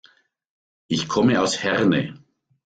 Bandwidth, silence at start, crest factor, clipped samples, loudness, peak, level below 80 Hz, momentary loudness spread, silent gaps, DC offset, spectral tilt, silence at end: 9.4 kHz; 0.9 s; 18 dB; under 0.1%; -21 LUFS; -6 dBFS; -58 dBFS; 8 LU; none; under 0.1%; -5 dB/octave; 0.5 s